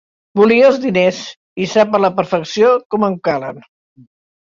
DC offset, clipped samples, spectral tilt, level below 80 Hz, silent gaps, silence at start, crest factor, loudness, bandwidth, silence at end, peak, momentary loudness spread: under 0.1%; under 0.1%; -5.5 dB/octave; -58 dBFS; 1.37-1.56 s, 2.85-2.90 s; 0.35 s; 14 dB; -14 LUFS; 7.6 kHz; 0.8 s; 0 dBFS; 13 LU